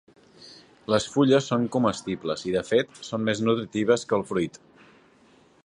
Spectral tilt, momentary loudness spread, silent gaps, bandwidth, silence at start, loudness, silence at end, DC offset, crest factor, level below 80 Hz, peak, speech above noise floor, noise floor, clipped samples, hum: -5.5 dB/octave; 9 LU; none; 11 kHz; 0.4 s; -25 LUFS; 1.15 s; under 0.1%; 20 dB; -60 dBFS; -6 dBFS; 33 dB; -58 dBFS; under 0.1%; none